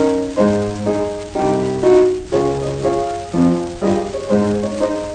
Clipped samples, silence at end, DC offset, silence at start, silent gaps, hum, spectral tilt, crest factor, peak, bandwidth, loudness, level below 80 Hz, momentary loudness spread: under 0.1%; 0 s; under 0.1%; 0 s; none; none; -7 dB/octave; 14 dB; -2 dBFS; 9.6 kHz; -17 LUFS; -40 dBFS; 7 LU